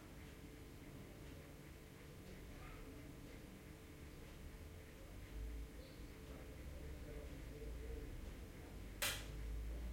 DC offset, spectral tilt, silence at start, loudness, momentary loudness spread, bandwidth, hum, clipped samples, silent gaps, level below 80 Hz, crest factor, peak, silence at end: under 0.1%; -4 dB/octave; 0 s; -53 LUFS; 8 LU; 16.5 kHz; none; under 0.1%; none; -54 dBFS; 24 dB; -28 dBFS; 0 s